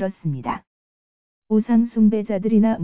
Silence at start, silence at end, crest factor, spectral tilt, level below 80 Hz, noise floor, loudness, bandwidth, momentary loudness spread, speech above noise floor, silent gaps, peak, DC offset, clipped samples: 0 s; 0 s; 14 dB; -12.5 dB/octave; -56 dBFS; under -90 dBFS; -20 LUFS; 3.5 kHz; 10 LU; over 71 dB; 0.67-1.42 s; -8 dBFS; under 0.1%; under 0.1%